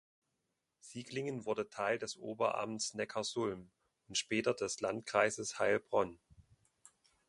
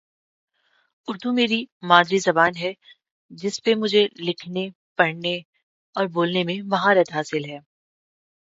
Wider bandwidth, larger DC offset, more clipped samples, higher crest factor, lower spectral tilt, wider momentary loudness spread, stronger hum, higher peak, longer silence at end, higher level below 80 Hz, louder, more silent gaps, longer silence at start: first, 11.5 kHz vs 8 kHz; neither; neither; about the same, 24 dB vs 24 dB; second, -3 dB/octave vs -4.5 dB/octave; second, 9 LU vs 13 LU; neither; second, -14 dBFS vs 0 dBFS; about the same, 0.85 s vs 0.9 s; about the same, -74 dBFS vs -72 dBFS; second, -37 LUFS vs -22 LUFS; second, none vs 1.72-1.80 s, 3.11-3.29 s, 4.75-4.95 s, 5.45-5.53 s, 5.63-5.93 s; second, 0.85 s vs 1.1 s